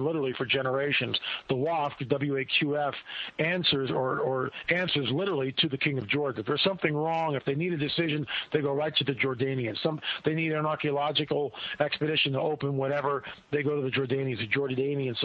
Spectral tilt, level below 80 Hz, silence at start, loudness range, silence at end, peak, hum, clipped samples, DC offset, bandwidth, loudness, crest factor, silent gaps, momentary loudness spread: -8 dB/octave; -66 dBFS; 0 s; 1 LU; 0 s; -10 dBFS; none; under 0.1%; under 0.1%; 6.2 kHz; -28 LUFS; 18 dB; none; 5 LU